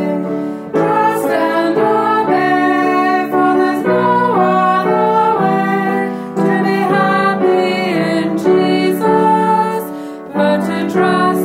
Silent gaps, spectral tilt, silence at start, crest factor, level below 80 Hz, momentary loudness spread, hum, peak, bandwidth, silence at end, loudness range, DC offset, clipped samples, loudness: none; -6.5 dB/octave; 0 s; 12 dB; -60 dBFS; 6 LU; none; -2 dBFS; 16 kHz; 0 s; 1 LU; under 0.1%; under 0.1%; -14 LUFS